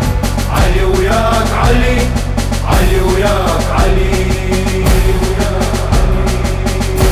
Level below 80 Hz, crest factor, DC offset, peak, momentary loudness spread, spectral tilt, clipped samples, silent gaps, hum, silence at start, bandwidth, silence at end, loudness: -14 dBFS; 12 dB; under 0.1%; 0 dBFS; 4 LU; -5.5 dB/octave; under 0.1%; none; none; 0 s; 16 kHz; 0 s; -13 LUFS